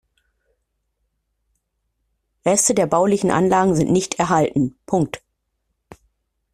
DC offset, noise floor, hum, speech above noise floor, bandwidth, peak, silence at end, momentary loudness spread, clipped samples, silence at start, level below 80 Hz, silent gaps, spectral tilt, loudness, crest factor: under 0.1%; -73 dBFS; none; 56 dB; 14 kHz; -4 dBFS; 1.35 s; 7 LU; under 0.1%; 2.45 s; -54 dBFS; none; -5 dB/octave; -18 LUFS; 18 dB